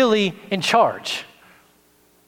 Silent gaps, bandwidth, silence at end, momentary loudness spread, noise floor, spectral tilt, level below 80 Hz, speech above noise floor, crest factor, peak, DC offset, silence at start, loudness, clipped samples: none; 17 kHz; 1.05 s; 10 LU; -58 dBFS; -4 dB/octave; -68 dBFS; 38 dB; 20 dB; -2 dBFS; under 0.1%; 0 s; -20 LUFS; under 0.1%